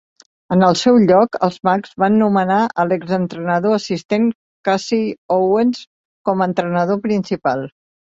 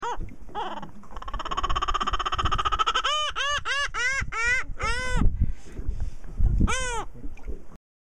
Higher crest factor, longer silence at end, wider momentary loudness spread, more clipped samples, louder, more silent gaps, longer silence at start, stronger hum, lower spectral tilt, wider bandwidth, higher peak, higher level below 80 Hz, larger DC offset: about the same, 16 dB vs 20 dB; about the same, 0.3 s vs 0.35 s; second, 8 LU vs 16 LU; neither; first, -17 LUFS vs -27 LUFS; first, 4.05-4.09 s, 4.35-4.64 s, 5.18-5.29 s, 5.87-6.25 s vs none; first, 0.5 s vs 0 s; neither; first, -6.5 dB/octave vs -3.5 dB/octave; second, 8 kHz vs 11 kHz; first, -2 dBFS vs -6 dBFS; second, -58 dBFS vs -30 dBFS; second, under 0.1% vs 2%